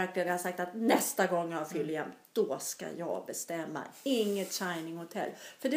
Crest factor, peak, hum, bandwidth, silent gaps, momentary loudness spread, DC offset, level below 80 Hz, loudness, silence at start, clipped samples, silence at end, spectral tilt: 22 dB; -12 dBFS; none; 15.5 kHz; none; 10 LU; under 0.1%; -88 dBFS; -34 LUFS; 0 s; under 0.1%; 0 s; -3.5 dB/octave